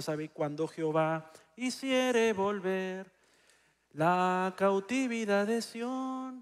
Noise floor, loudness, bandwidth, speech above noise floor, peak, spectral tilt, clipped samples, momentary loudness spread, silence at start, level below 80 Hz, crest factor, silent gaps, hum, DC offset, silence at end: -67 dBFS; -31 LUFS; 15 kHz; 36 dB; -14 dBFS; -5 dB/octave; under 0.1%; 10 LU; 0 s; -80 dBFS; 18 dB; none; none; under 0.1%; 0 s